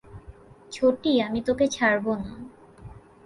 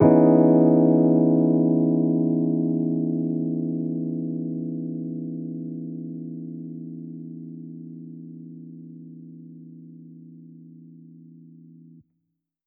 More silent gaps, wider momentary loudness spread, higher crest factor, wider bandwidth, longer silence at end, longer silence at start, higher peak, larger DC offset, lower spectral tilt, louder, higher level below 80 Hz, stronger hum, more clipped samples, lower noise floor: neither; second, 20 LU vs 25 LU; about the same, 16 dB vs 20 dB; first, 11.5 kHz vs 2.5 kHz; second, 0.25 s vs 1.8 s; about the same, 0.1 s vs 0 s; second, -10 dBFS vs -4 dBFS; neither; second, -4.5 dB/octave vs -14 dB/octave; about the same, -24 LUFS vs -22 LUFS; first, -52 dBFS vs -70 dBFS; neither; neither; second, -48 dBFS vs -78 dBFS